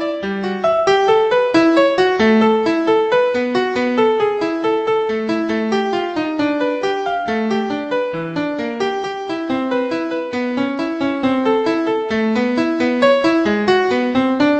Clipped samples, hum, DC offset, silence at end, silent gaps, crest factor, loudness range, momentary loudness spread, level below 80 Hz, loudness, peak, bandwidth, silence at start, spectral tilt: under 0.1%; none; under 0.1%; 0 s; none; 16 dB; 6 LU; 8 LU; -54 dBFS; -17 LUFS; -2 dBFS; 8.6 kHz; 0 s; -5.5 dB/octave